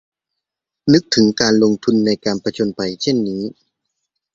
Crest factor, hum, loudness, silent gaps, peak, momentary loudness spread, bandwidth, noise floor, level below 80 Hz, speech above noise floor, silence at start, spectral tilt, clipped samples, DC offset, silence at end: 18 dB; none; -17 LUFS; none; 0 dBFS; 10 LU; 7.8 kHz; -82 dBFS; -54 dBFS; 66 dB; 0.85 s; -5 dB/octave; under 0.1%; under 0.1%; 0.85 s